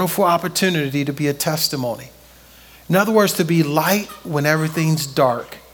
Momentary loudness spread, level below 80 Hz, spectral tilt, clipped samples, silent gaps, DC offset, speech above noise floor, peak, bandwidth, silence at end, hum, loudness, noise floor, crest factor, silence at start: 7 LU; -54 dBFS; -4.5 dB/octave; under 0.1%; none; under 0.1%; 27 dB; -2 dBFS; 18 kHz; 0.15 s; none; -18 LUFS; -46 dBFS; 18 dB; 0 s